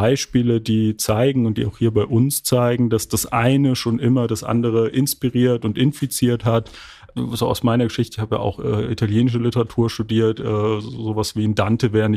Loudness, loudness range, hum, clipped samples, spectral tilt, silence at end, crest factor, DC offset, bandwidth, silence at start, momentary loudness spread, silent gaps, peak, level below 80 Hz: -19 LUFS; 3 LU; none; under 0.1%; -6 dB/octave; 0 s; 14 dB; under 0.1%; 15.5 kHz; 0 s; 5 LU; none; -4 dBFS; -46 dBFS